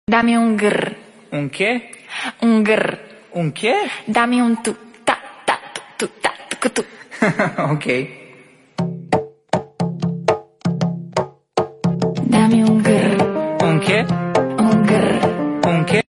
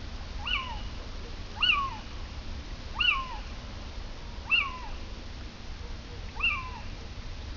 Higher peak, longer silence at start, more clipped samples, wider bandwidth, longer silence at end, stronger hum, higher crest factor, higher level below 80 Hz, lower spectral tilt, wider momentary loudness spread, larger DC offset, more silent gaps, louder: first, 0 dBFS vs -14 dBFS; about the same, 0.1 s vs 0 s; neither; first, 11.5 kHz vs 6 kHz; about the same, 0.1 s vs 0 s; neither; about the same, 18 dB vs 18 dB; second, -54 dBFS vs -40 dBFS; first, -6 dB/octave vs -3.5 dB/octave; second, 11 LU vs 17 LU; second, under 0.1% vs 0.2%; neither; first, -18 LUFS vs -30 LUFS